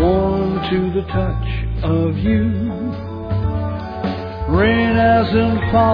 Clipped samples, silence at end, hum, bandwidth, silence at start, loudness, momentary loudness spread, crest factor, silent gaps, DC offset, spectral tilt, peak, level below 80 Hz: under 0.1%; 0 s; none; 5.2 kHz; 0 s; -18 LUFS; 10 LU; 14 dB; none; under 0.1%; -10 dB/octave; -2 dBFS; -28 dBFS